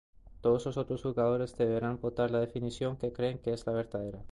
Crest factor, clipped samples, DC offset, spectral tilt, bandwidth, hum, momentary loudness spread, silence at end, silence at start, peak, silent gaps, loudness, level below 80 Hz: 14 dB; under 0.1%; under 0.1%; -7.5 dB/octave; 11 kHz; none; 5 LU; 0 s; 0.25 s; -18 dBFS; none; -33 LUFS; -54 dBFS